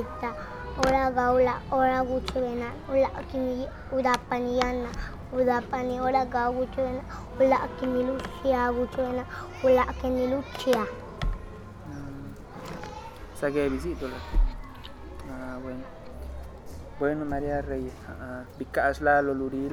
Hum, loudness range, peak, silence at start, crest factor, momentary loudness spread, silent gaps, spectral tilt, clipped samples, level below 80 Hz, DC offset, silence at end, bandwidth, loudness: none; 8 LU; -6 dBFS; 0 s; 22 dB; 18 LU; none; -6 dB/octave; under 0.1%; -38 dBFS; under 0.1%; 0 s; 15 kHz; -28 LUFS